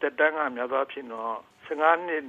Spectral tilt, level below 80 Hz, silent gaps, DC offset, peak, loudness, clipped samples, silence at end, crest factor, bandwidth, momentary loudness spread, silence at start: -5 dB/octave; -78 dBFS; none; under 0.1%; -8 dBFS; -27 LUFS; under 0.1%; 0 s; 20 dB; 7.4 kHz; 12 LU; 0 s